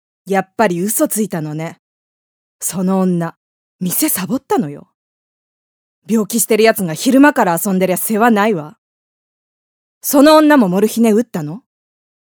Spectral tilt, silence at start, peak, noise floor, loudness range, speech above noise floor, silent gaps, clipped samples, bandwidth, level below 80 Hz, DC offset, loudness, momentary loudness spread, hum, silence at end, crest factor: -4.5 dB/octave; 0.25 s; 0 dBFS; under -90 dBFS; 6 LU; over 76 dB; 1.79-2.59 s, 3.37-3.79 s, 4.94-6.02 s, 8.78-10.01 s; under 0.1%; over 20 kHz; -60 dBFS; under 0.1%; -14 LUFS; 14 LU; none; 0.7 s; 16 dB